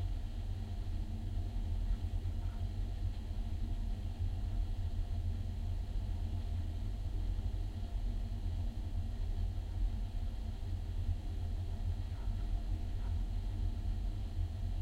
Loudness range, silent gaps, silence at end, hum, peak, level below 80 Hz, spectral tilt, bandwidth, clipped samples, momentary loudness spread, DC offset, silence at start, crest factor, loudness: 1 LU; none; 0 s; none; -24 dBFS; -38 dBFS; -7.5 dB/octave; 8.8 kHz; under 0.1%; 2 LU; under 0.1%; 0 s; 12 dB; -41 LUFS